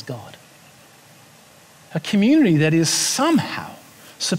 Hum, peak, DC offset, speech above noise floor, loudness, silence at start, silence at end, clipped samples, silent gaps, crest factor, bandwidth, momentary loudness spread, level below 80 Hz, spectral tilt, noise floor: none; -6 dBFS; under 0.1%; 31 dB; -18 LUFS; 0 s; 0 s; under 0.1%; none; 16 dB; 16 kHz; 18 LU; -64 dBFS; -4.5 dB/octave; -49 dBFS